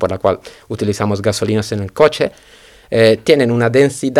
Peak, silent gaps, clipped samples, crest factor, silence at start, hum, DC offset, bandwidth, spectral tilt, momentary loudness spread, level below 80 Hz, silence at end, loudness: 0 dBFS; none; 0.1%; 14 dB; 0 s; none; under 0.1%; 14 kHz; -5.5 dB/octave; 9 LU; -48 dBFS; 0 s; -15 LUFS